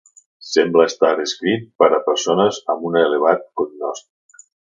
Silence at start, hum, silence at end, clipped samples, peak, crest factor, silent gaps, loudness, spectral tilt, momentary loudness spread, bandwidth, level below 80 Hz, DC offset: 0.45 s; none; 0.8 s; under 0.1%; 0 dBFS; 18 dB; 1.75-1.79 s; -18 LUFS; -4 dB/octave; 10 LU; 7.6 kHz; -66 dBFS; under 0.1%